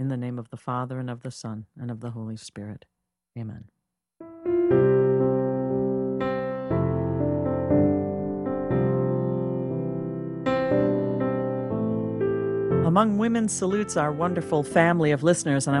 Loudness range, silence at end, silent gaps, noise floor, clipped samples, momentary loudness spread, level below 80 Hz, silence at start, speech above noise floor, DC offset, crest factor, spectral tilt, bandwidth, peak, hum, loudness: 11 LU; 0 s; none; -50 dBFS; under 0.1%; 15 LU; -52 dBFS; 0 s; 25 dB; under 0.1%; 22 dB; -6.5 dB/octave; 11.5 kHz; -4 dBFS; none; -25 LUFS